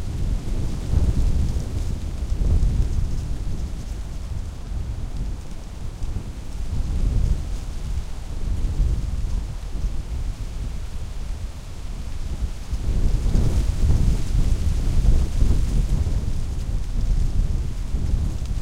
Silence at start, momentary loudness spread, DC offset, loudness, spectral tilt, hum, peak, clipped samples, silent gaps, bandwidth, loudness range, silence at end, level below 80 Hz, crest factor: 0 s; 11 LU; under 0.1%; -27 LUFS; -6.5 dB/octave; none; -4 dBFS; under 0.1%; none; 11.5 kHz; 9 LU; 0 s; -22 dBFS; 16 dB